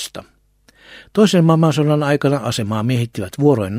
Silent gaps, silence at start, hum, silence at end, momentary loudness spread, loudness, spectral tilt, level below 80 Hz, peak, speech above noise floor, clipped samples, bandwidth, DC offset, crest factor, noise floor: none; 0 s; none; 0 s; 11 LU; -16 LUFS; -6.5 dB/octave; -54 dBFS; -2 dBFS; 39 dB; under 0.1%; 15.5 kHz; under 0.1%; 16 dB; -55 dBFS